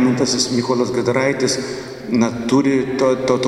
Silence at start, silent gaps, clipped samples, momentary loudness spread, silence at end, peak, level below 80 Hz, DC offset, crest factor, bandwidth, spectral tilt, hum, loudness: 0 s; none; under 0.1%; 6 LU; 0 s; -2 dBFS; -52 dBFS; under 0.1%; 16 dB; 12.5 kHz; -4.5 dB/octave; none; -18 LUFS